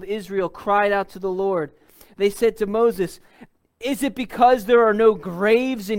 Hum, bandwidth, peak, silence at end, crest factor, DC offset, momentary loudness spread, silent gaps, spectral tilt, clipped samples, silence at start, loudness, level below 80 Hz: none; 17 kHz; -4 dBFS; 0 s; 18 dB; under 0.1%; 11 LU; none; -5.5 dB/octave; under 0.1%; 0 s; -20 LUFS; -52 dBFS